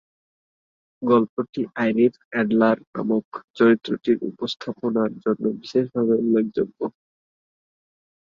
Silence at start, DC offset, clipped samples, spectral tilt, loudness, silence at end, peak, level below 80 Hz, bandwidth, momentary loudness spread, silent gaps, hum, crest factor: 1 s; under 0.1%; under 0.1%; -7.5 dB/octave; -22 LUFS; 1.4 s; -4 dBFS; -66 dBFS; 7.2 kHz; 10 LU; 1.29-1.37 s, 1.49-1.53 s, 2.25-2.31 s, 2.87-2.93 s, 3.25-3.32 s, 3.44-3.54 s; none; 18 dB